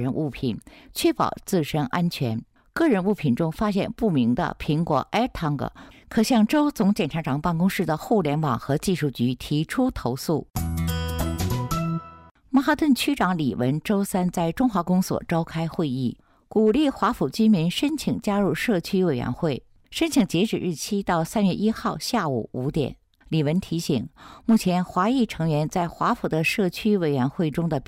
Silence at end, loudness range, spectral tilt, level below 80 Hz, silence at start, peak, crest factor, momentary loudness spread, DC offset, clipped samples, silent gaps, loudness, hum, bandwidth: 0 s; 2 LU; -6 dB/octave; -46 dBFS; 0 s; -10 dBFS; 12 dB; 7 LU; under 0.1%; under 0.1%; 12.31-12.35 s; -24 LUFS; none; 16 kHz